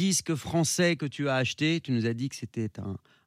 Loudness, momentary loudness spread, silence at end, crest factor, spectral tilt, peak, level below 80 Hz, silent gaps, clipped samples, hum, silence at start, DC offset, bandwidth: -28 LUFS; 10 LU; 0.3 s; 16 dB; -4.5 dB/octave; -12 dBFS; -66 dBFS; none; under 0.1%; none; 0 s; under 0.1%; 15.5 kHz